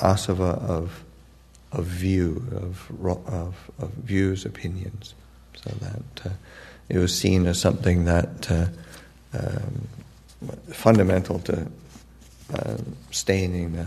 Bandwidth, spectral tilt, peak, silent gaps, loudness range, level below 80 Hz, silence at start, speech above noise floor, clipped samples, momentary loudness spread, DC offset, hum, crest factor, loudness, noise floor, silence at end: 13.5 kHz; -6 dB/octave; 0 dBFS; none; 6 LU; -42 dBFS; 0 s; 27 dB; under 0.1%; 19 LU; under 0.1%; none; 24 dB; -25 LUFS; -51 dBFS; 0 s